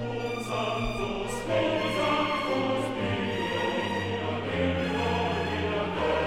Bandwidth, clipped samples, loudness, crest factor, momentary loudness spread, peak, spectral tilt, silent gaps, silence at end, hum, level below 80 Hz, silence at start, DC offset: 17.5 kHz; under 0.1%; -28 LUFS; 14 dB; 5 LU; -14 dBFS; -5.5 dB/octave; none; 0 s; none; -46 dBFS; 0 s; 0.2%